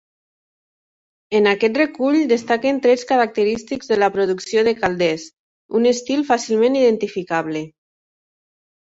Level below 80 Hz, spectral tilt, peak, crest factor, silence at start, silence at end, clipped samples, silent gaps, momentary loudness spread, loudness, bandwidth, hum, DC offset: -58 dBFS; -4.5 dB/octave; -2 dBFS; 16 dB; 1.3 s; 1.15 s; under 0.1%; 5.33-5.69 s; 7 LU; -18 LUFS; 8 kHz; none; under 0.1%